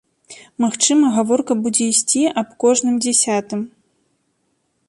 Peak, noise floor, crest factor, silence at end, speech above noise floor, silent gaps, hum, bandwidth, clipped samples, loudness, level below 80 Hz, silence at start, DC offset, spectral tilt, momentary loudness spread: -2 dBFS; -67 dBFS; 18 dB; 1.2 s; 51 dB; none; none; 11.5 kHz; under 0.1%; -17 LUFS; -66 dBFS; 0.3 s; under 0.1%; -3 dB/octave; 10 LU